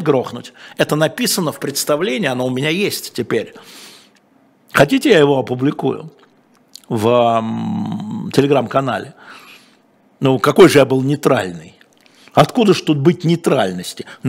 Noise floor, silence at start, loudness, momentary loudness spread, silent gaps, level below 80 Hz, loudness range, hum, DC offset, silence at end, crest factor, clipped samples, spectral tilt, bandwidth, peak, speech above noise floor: -54 dBFS; 0 s; -15 LUFS; 15 LU; none; -56 dBFS; 5 LU; none; under 0.1%; 0 s; 16 dB; under 0.1%; -5.5 dB/octave; 16.5 kHz; 0 dBFS; 38 dB